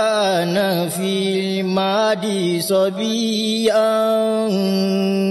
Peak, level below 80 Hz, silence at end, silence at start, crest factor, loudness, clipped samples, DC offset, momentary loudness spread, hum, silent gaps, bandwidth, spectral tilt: -6 dBFS; -68 dBFS; 0 s; 0 s; 12 dB; -18 LUFS; under 0.1%; under 0.1%; 4 LU; none; none; 13 kHz; -5 dB/octave